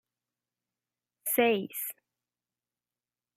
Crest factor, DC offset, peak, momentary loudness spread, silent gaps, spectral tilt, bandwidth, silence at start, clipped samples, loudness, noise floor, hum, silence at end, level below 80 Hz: 22 dB; under 0.1%; -12 dBFS; 12 LU; none; -3 dB/octave; 16 kHz; 1.25 s; under 0.1%; -30 LUFS; under -90 dBFS; 60 Hz at -60 dBFS; 1.45 s; under -90 dBFS